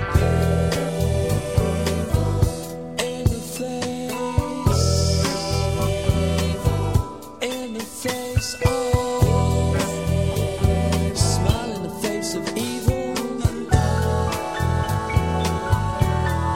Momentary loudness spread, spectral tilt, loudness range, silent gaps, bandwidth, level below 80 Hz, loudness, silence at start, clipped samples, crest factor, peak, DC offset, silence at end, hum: 7 LU; -5.5 dB/octave; 2 LU; none; 16.5 kHz; -30 dBFS; -22 LUFS; 0 s; under 0.1%; 18 dB; -4 dBFS; 0.4%; 0 s; none